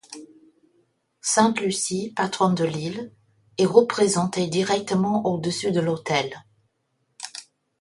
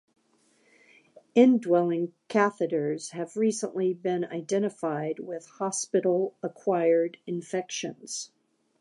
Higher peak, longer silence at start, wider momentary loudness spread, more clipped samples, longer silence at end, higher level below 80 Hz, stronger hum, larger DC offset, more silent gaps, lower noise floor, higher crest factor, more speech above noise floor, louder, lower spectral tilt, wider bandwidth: first, -2 dBFS vs -8 dBFS; second, 0.1 s vs 1.35 s; first, 18 LU vs 12 LU; neither; second, 0.4 s vs 0.55 s; first, -64 dBFS vs -84 dBFS; neither; neither; neither; first, -72 dBFS vs -67 dBFS; about the same, 22 dB vs 20 dB; first, 50 dB vs 40 dB; first, -23 LUFS vs -27 LUFS; about the same, -4.5 dB/octave vs -5 dB/octave; about the same, 11.5 kHz vs 11.5 kHz